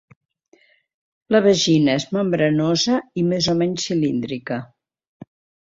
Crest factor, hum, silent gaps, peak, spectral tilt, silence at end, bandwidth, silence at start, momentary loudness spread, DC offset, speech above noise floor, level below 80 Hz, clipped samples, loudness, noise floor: 18 dB; none; none; -2 dBFS; -5 dB/octave; 0.95 s; 7.8 kHz; 1.3 s; 10 LU; under 0.1%; 39 dB; -58 dBFS; under 0.1%; -19 LUFS; -58 dBFS